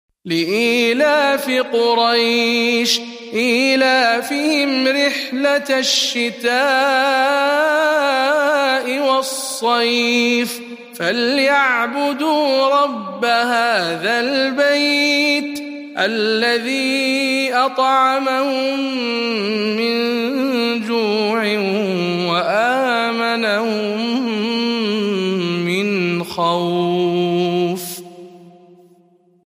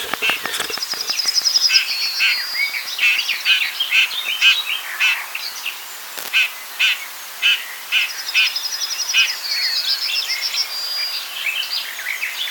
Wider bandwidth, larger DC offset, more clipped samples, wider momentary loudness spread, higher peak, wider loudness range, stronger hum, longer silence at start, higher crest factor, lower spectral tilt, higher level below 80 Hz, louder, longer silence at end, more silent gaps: second, 15.5 kHz vs 19 kHz; neither; neither; second, 6 LU vs 9 LU; about the same, -2 dBFS vs 0 dBFS; about the same, 3 LU vs 3 LU; neither; first, 0.25 s vs 0 s; about the same, 16 dB vs 20 dB; first, -3.5 dB/octave vs 3 dB/octave; about the same, -70 dBFS vs -72 dBFS; about the same, -16 LUFS vs -17 LUFS; first, 0.95 s vs 0 s; neither